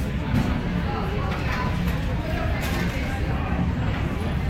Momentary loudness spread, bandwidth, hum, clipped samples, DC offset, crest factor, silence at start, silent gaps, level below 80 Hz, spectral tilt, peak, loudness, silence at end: 2 LU; 16 kHz; none; under 0.1%; under 0.1%; 14 dB; 0 s; none; -30 dBFS; -7 dB/octave; -10 dBFS; -26 LUFS; 0 s